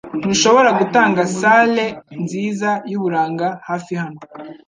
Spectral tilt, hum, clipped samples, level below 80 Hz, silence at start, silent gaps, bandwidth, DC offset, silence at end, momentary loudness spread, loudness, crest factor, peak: -4 dB/octave; none; under 0.1%; -60 dBFS; 0.05 s; none; 9.8 kHz; under 0.1%; 0.15 s; 13 LU; -16 LUFS; 16 dB; -2 dBFS